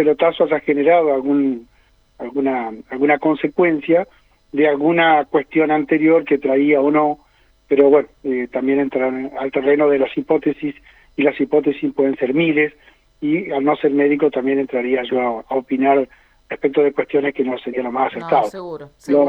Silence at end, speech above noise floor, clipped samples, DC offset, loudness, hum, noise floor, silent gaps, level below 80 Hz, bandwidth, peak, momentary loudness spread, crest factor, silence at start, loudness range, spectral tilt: 0 s; 36 dB; under 0.1%; under 0.1%; -17 LUFS; none; -52 dBFS; none; -56 dBFS; 5.8 kHz; -2 dBFS; 10 LU; 16 dB; 0 s; 3 LU; -7.5 dB/octave